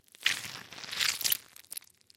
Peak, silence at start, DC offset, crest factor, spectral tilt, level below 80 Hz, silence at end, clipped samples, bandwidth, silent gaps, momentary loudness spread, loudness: -6 dBFS; 0.2 s; under 0.1%; 30 dB; 1.5 dB/octave; -76 dBFS; 0.4 s; under 0.1%; 17 kHz; none; 15 LU; -31 LUFS